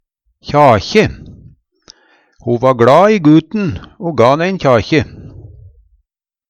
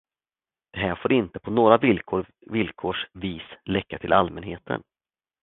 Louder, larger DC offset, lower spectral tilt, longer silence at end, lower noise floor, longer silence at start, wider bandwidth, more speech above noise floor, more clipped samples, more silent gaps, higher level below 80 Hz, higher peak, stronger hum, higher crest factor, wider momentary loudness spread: first, -11 LUFS vs -24 LUFS; neither; second, -7 dB/octave vs -10.5 dB/octave; first, 1.1 s vs 0.65 s; second, -68 dBFS vs under -90 dBFS; second, 0.45 s vs 0.75 s; first, 9.4 kHz vs 4.1 kHz; second, 57 dB vs over 66 dB; neither; neither; first, -40 dBFS vs -50 dBFS; about the same, 0 dBFS vs 0 dBFS; neither; second, 14 dB vs 24 dB; about the same, 13 LU vs 14 LU